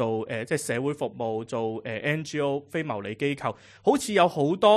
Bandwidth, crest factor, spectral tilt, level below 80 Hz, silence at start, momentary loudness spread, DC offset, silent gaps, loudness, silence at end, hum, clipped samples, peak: 13 kHz; 20 dB; -5 dB/octave; -64 dBFS; 0 s; 9 LU; under 0.1%; none; -27 LUFS; 0 s; none; under 0.1%; -6 dBFS